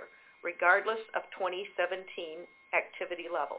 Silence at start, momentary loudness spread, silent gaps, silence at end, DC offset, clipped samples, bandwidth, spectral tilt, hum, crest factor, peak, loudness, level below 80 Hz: 0 s; 15 LU; none; 0 s; under 0.1%; under 0.1%; 4 kHz; 0.5 dB/octave; none; 24 dB; -10 dBFS; -32 LUFS; -80 dBFS